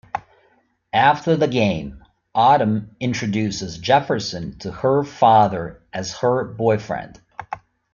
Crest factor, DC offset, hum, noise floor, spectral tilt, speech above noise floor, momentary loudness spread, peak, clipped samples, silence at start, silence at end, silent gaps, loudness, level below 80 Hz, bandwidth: 18 dB; under 0.1%; none; -61 dBFS; -5.5 dB/octave; 42 dB; 16 LU; -2 dBFS; under 0.1%; 0.15 s; 0.35 s; none; -19 LUFS; -52 dBFS; 7.2 kHz